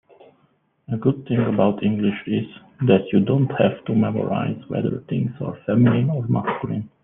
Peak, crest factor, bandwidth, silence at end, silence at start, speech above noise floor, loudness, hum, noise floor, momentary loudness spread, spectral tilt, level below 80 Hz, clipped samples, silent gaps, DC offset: -2 dBFS; 18 dB; 3.8 kHz; 0.15 s; 0.9 s; 43 dB; -21 LUFS; none; -63 dBFS; 9 LU; -11.5 dB/octave; -58 dBFS; under 0.1%; none; under 0.1%